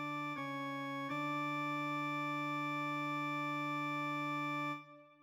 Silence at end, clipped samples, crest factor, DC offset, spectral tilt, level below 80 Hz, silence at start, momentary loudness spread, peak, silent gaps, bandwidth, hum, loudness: 0.1 s; under 0.1%; 10 dB; under 0.1%; -5.5 dB/octave; under -90 dBFS; 0 s; 3 LU; -30 dBFS; none; over 20 kHz; none; -39 LUFS